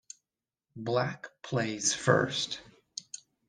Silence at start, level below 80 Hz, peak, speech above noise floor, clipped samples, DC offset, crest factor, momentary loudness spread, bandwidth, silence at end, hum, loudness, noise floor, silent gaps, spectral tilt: 0.75 s; -66 dBFS; -8 dBFS; over 60 dB; under 0.1%; under 0.1%; 26 dB; 18 LU; 10.5 kHz; 0.3 s; none; -30 LUFS; under -90 dBFS; none; -3.5 dB/octave